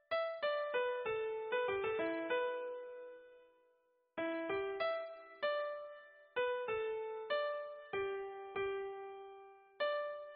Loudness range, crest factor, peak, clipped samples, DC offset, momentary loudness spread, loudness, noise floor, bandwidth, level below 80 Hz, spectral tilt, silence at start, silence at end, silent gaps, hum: 3 LU; 14 dB; -26 dBFS; under 0.1%; under 0.1%; 13 LU; -40 LUFS; -76 dBFS; 4.9 kHz; -78 dBFS; -1 dB/octave; 0.1 s; 0 s; none; none